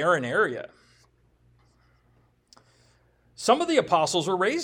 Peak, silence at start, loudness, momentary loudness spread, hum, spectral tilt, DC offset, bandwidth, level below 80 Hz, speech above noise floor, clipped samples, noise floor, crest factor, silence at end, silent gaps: -6 dBFS; 0 s; -24 LUFS; 10 LU; none; -3.5 dB/octave; under 0.1%; 16.5 kHz; -66 dBFS; 40 dB; under 0.1%; -64 dBFS; 22 dB; 0 s; none